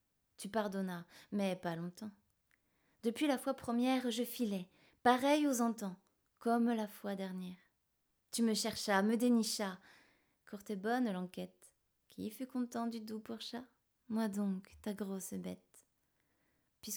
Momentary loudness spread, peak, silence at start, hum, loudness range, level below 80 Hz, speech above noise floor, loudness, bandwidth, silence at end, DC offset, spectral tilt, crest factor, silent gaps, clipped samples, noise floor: 17 LU; -16 dBFS; 0.4 s; none; 8 LU; -78 dBFS; 45 dB; -38 LUFS; over 20 kHz; 0 s; under 0.1%; -4.5 dB/octave; 22 dB; none; under 0.1%; -82 dBFS